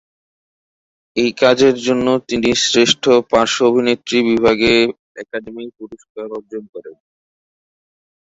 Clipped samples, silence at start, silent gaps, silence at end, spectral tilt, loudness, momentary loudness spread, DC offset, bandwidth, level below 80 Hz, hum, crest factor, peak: under 0.1%; 1.15 s; 4.99-5.15 s, 6.10-6.15 s, 6.69-6.73 s; 1.35 s; -3.5 dB/octave; -14 LUFS; 19 LU; under 0.1%; 8 kHz; -48 dBFS; none; 16 dB; 0 dBFS